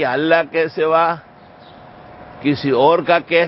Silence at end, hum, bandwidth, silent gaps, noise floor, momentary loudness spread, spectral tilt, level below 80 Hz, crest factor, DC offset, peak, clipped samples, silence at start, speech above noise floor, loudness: 0 s; none; 5.8 kHz; none; -42 dBFS; 7 LU; -10.5 dB/octave; -56 dBFS; 16 dB; under 0.1%; 0 dBFS; under 0.1%; 0 s; 27 dB; -16 LUFS